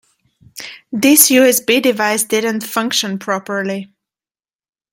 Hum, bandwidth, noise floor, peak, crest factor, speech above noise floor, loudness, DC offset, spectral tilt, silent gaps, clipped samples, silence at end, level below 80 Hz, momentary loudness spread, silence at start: none; 17 kHz; under -90 dBFS; 0 dBFS; 16 dB; over 76 dB; -13 LUFS; under 0.1%; -2.5 dB/octave; none; under 0.1%; 1.1 s; -64 dBFS; 18 LU; 0.55 s